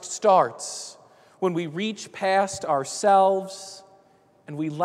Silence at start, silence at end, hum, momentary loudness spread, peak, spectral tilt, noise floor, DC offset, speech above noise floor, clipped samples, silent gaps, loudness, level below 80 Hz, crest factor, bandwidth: 0 s; 0 s; none; 18 LU; -6 dBFS; -4 dB/octave; -59 dBFS; under 0.1%; 35 dB; under 0.1%; none; -23 LUFS; -72 dBFS; 18 dB; 13.5 kHz